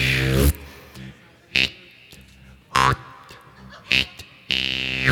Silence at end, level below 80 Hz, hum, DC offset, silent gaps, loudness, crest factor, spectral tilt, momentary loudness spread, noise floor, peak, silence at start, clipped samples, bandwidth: 0 s; -34 dBFS; none; under 0.1%; none; -21 LUFS; 24 dB; -4 dB/octave; 22 LU; -48 dBFS; 0 dBFS; 0 s; under 0.1%; 19 kHz